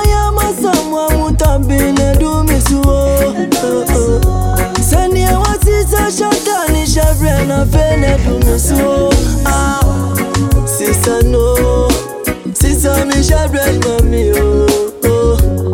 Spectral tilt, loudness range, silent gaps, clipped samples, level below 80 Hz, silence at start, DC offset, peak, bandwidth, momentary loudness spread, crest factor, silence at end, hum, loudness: -5.5 dB/octave; 1 LU; none; under 0.1%; -16 dBFS; 0 s; under 0.1%; 0 dBFS; 18.5 kHz; 2 LU; 10 dB; 0 s; none; -12 LUFS